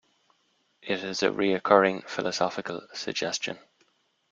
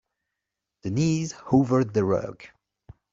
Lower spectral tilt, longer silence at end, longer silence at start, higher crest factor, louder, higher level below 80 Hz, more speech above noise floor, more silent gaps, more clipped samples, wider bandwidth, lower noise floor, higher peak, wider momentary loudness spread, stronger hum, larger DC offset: second, -3.5 dB/octave vs -7 dB/octave; about the same, 0.75 s vs 0.65 s; about the same, 0.85 s vs 0.85 s; about the same, 24 dB vs 20 dB; second, -27 LUFS vs -24 LUFS; second, -70 dBFS vs -56 dBFS; second, 44 dB vs 61 dB; neither; neither; about the same, 7.8 kHz vs 7.8 kHz; second, -70 dBFS vs -85 dBFS; about the same, -4 dBFS vs -6 dBFS; first, 14 LU vs 11 LU; neither; neither